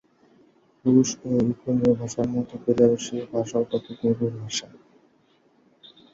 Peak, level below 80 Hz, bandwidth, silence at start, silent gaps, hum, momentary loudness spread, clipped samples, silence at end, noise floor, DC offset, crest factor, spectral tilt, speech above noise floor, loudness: -6 dBFS; -58 dBFS; 7.8 kHz; 0.85 s; none; none; 9 LU; under 0.1%; 1.5 s; -62 dBFS; under 0.1%; 20 dB; -6 dB/octave; 39 dB; -24 LUFS